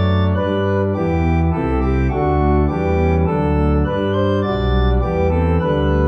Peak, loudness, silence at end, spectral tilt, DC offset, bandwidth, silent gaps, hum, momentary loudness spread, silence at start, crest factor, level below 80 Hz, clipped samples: -6 dBFS; -17 LUFS; 0 s; -9.5 dB/octave; under 0.1%; 6.2 kHz; none; none; 2 LU; 0 s; 10 dB; -22 dBFS; under 0.1%